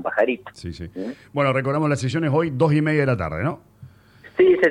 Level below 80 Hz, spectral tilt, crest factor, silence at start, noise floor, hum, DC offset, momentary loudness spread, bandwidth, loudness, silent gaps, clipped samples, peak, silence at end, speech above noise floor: -50 dBFS; -7.5 dB/octave; 14 dB; 0 s; -48 dBFS; none; under 0.1%; 15 LU; 11 kHz; -21 LUFS; none; under 0.1%; -6 dBFS; 0 s; 28 dB